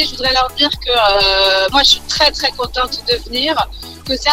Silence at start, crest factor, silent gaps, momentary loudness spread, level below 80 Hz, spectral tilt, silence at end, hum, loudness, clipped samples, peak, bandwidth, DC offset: 0 s; 14 dB; none; 8 LU; -32 dBFS; -2 dB/octave; 0 s; none; -13 LUFS; under 0.1%; 0 dBFS; 18.5 kHz; under 0.1%